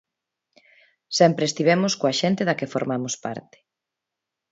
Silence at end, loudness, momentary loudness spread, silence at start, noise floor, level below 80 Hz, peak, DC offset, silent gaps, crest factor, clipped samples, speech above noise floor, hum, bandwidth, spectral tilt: 1.1 s; -22 LUFS; 11 LU; 1.1 s; -85 dBFS; -68 dBFS; -4 dBFS; under 0.1%; none; 20 dB; under 0.1%; 63 dB; none; 8 kHz; -4.5 dB/octave